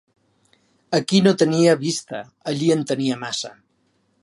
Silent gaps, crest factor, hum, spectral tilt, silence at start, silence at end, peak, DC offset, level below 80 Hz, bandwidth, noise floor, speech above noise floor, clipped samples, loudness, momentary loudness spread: none; 20 dB; none; -5 dB/octave; 0.9 s; 0.7 s; -2 dBFS; under 0.1%; -68 dBFS; 11.5 kHz; -66 dBFS; 46 dB; under 0.1%; -20 LUFS; 12 LU